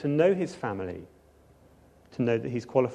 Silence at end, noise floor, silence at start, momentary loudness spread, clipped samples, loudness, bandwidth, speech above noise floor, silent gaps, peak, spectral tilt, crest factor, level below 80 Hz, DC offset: 0 s; -58 dBFS; 0 s; 16 LU; under 0.1%; -28 LUFS; 10 kHz; 31 dB; none; -10 dBFS; -7.5 dB/octave; 20 dB; -62 dBFS; under 0.1%